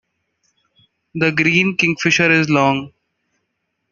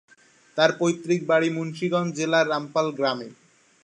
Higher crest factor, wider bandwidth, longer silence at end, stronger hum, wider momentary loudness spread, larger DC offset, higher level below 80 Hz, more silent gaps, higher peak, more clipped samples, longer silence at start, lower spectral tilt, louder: about the same, 18 dB vs 20 dB; second, 7.4 kHz vs 9.6 kHz; first, 1.05 s vs 0.5 s; neither; about the same, 7 LU vs 7 LU; neither; first, -58 dBFS vs -74 dBFS; neither; about the same, -2 dBFS vs -4 dBFS; neither; first, 1.15 s vs 0.55 s; about the same, -5 dB/octave vs -5 dB/octave; first, -15 LUFS vs -24 LUFS